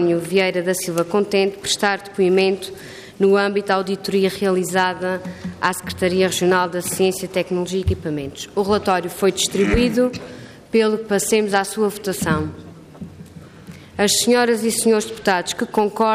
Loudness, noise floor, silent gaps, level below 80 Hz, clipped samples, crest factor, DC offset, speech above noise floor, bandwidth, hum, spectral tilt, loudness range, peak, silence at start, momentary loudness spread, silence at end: -19 LUFS; -40 dBFS; none; -44 dBFS; under 0.1%; 14 dB; under 0.1%; 21 dB; 15.5 kHz; none; -4 dB/octave; 2 LU; -4 dBFS; 0 s; 11 LU; 0 s